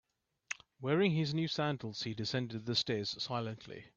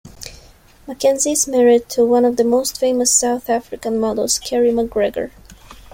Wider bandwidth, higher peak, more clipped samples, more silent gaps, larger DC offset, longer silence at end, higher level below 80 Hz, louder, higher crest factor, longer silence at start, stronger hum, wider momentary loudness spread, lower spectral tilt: second, 7.8 kHz vs 16.5 kHz; second, -18 dBFS vs -2 dBFS; neither; neither; neither; about the same, 0.1 s vs 0.2 s; second, -72 dBFS vs -46 dBFS; second, -36 LUFS vs -16 LUFS; about the same, 18 dB vs 16 dB; first, 0.5 s vs 0.05 s; neither; about the same, 13 LU vs 14 LU; first, -5.5 dB/octave vs -2.5 dB/octave